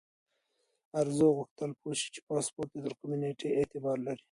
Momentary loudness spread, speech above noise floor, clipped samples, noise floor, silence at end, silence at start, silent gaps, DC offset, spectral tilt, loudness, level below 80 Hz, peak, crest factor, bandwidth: 12 LU; 46 dB; under 0.1%; -78 dBFS; 0.15 s; 0.95 s; 1.51-1.56 s, 2.22-2.27 s; under 0.1%; -5 dB/octave; -33 LUFS; -70 dBFS; -16 dBFS; 18 dB; 11.5 kHz